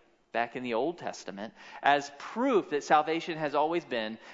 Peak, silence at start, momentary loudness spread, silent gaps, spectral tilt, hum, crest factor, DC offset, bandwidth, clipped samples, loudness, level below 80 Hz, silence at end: -10 dBFS; 0.35 s; 13 LU; none; -4.5 dB/octave; none; 20 dB; under 0.1%; 7.8 kHz; under 0.1%; -30 LUFS; -78 dBFS; 0 s